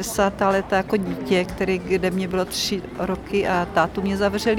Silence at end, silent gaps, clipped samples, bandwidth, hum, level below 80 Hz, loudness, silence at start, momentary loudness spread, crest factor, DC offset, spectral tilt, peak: 0 s; none; under 0.1%; over 20 kHz; none; -42 dBFS; -22 LUFS; 0 s; 4 LU; 16 dB; under 0.1%; -5 dB/octave; -6 dBFS